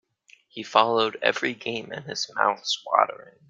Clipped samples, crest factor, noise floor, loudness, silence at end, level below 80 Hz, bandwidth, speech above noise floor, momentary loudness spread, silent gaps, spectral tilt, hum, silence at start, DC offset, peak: under 0.1%; 24 dB; -58 dBFS; -24 LUFS; 0.2 s; -72 dBFS; 9.4 kHz; 33 dB; 12 LU; none; -2.5 dB/octave; none; 0.55 s; under 0.1%; -2 dBFS